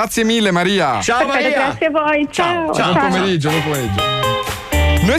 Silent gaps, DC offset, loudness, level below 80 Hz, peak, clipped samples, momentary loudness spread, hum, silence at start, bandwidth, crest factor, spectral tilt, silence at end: none; under 0.1%; -16 LUFS; -28 dBFS; -6 dBFS; under 0.1%; 3 LU; none; 0 s; 16 kHz; 10 dB; -4.5 dB/octave; 0 s